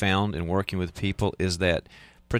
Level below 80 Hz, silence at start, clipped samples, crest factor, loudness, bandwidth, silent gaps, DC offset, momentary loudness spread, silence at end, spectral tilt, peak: -44 dBFS; 0 s; under 0.1%; 16 dB; -27 LUFS; 14.5 kHz; none; under 0.1%; 6 LU; 0 s; -5.5 dB/octave; -10 dBFS